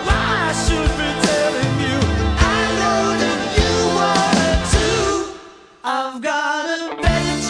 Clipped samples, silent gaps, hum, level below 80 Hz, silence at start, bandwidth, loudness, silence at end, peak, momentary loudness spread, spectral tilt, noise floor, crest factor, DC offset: under 0.1%; none; none; -26 dBFS; 0 s; 10.5 kHz; -18 LUFS; 0 s; -2 dBFS; 6 LU; -4.5 dB/octave; -41 dBFS; 16 dB; under 0.1%